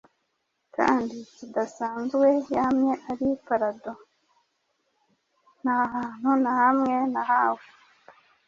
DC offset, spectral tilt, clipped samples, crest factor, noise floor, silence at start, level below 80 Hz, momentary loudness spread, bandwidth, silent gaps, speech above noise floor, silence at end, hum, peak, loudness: under 0.1%; -6 dB/octave; under 0.1%; 18 dB; -76 dBFS; 0.8 s; -66 dBFS; 14 LU; 7.4 kHz; none; 52 dB; 0.9 s; none; -8 dBFS; -25 LUFS